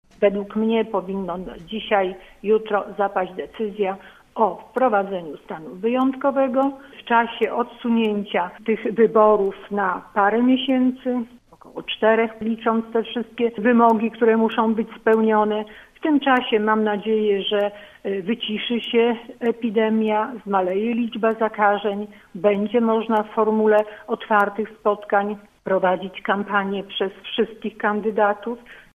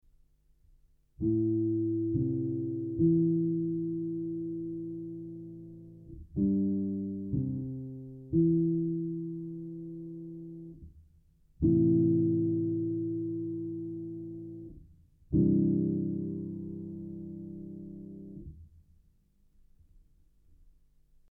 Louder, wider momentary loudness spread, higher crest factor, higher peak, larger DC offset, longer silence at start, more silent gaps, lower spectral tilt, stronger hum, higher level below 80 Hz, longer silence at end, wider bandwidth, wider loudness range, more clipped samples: first, -21 LUFS vs -31 LUFS; second, 11 LU vs 19 LU; about the same, 18 dB vs 16 dB; first, -2 dBFS vs -16 dBFS; neither; second, 0.2 s vs 1.2 s; neither; second, -7.5 dB/octave vs -15 dB/octave; neither; about the same, -60 dBFS vs -56 dBFS; second, 0.15 s vs 2.5 s; first, 3.8 kHz vs 1 kHz; second, 4 LU vs 12 LU; neither